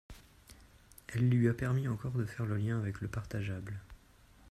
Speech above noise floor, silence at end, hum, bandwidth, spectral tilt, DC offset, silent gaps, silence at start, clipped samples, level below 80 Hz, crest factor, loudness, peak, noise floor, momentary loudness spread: 28 dB; 0.55 s; none; 13.5 kHz; -8 dB/octave; under 0.1%; none; 0.1 s; under 0.1%; -58 dBFS; 18 dB; -35 LUFS; -18 dBFS; -61 dBFS; 16 LU